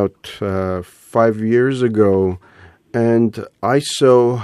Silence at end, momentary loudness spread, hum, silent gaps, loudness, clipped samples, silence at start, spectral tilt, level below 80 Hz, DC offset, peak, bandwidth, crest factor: 0 s; 11 LU; none; none; -17 LUFS; under 0.1%; 0 s; -6.5 dB/octave; -54 dBFS; under 0.1%; 0 dBFS; 12.5 kHz; 16 dB